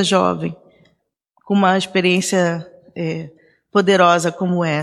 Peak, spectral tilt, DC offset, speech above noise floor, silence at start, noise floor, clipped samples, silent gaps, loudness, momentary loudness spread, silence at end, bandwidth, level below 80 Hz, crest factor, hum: -2 dBFS; -5 dB/octave; under 0.1%; 49 dB; 0 s; -65 dBFS; under 0.1%; none; -17 LUFS; 15 LU; 0 s; 13.5 kHz; -62 dBFS; 16 dB; none